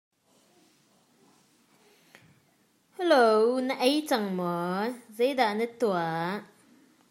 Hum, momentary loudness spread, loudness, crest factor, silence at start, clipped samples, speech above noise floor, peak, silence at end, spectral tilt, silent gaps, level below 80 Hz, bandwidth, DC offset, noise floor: none; 10 LU; -27 LUFS; 20 dB; 3 s; under 0.1%; 41 dB; -10 dBFS; 0.65 s; -5 dB/octave; none; -86 dBFS; 16 kHz; under 0.1%; -67 dBFS